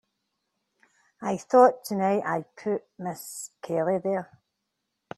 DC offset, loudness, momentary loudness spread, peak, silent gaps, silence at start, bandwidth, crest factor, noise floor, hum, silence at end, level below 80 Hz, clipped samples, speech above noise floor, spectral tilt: under 0.1%; -26 LUFS; 17 LU; -6 dBFS; none; 1.2 s; 13 kHz; 22 dB; -81 dBFS; none; 0.95 s; -74 dBFS; under 0.1%; 55 dB; -6 dB/octave